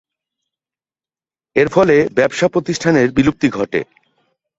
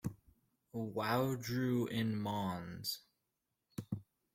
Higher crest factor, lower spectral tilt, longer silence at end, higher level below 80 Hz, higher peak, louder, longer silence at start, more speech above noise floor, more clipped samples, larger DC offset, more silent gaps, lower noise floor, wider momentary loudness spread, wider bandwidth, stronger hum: about the same, 16 dB vs 20 dB; about the same, -6 dB/octave vs -6 dB/octave; first, 0.75 s vs 0.3 s; first, -48 dBFS vs -70 dBFS; first, 0 dBFS vs -20 dBFS; first, -15 LUFS vs -39 LUFS; first, 1.55 s vs 0.05 s; first, over 76 dB vs 50 dB; neither; neither; neither; about the same, under -90 dBFS vs -87 dBFS; second, 8 LU vs 12 LU; second, 8 kHz vs 16.5 kHz; neither